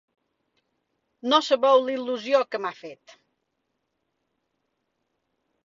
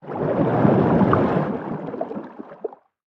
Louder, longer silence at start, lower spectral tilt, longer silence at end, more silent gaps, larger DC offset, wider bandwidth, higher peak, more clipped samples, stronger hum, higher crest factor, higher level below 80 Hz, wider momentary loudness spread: second, -23 LUFS vs -20 LUFS; first, 1.25 s vs 0.05 s; second, -3 dB/octave vs -10.5 dB/octave; first, 2.7 s vs 0.35 s; neither; neither; first, 7.6 kHz vs 5.8 kHz; second, -6 dBFS vs -2 dBFS; neither; neither; about the same, 22 dB vs 20 dB; second, -78 dBFS vs -50 dBFS; about the same, 16 LU vs 17 LU